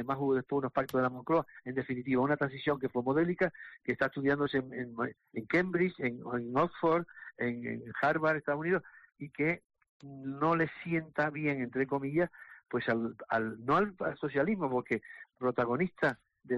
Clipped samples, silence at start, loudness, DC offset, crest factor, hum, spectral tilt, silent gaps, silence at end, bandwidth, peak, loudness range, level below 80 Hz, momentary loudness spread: under 0.1%; 0 s; -33 LUFS; under 0.1%; 14 dB; none; -8 dB/octave; 9.89-10.00 s; 0 s; 12.5 kHz; -18 dBFS; 2 LU; -66 dBFS; 9 LU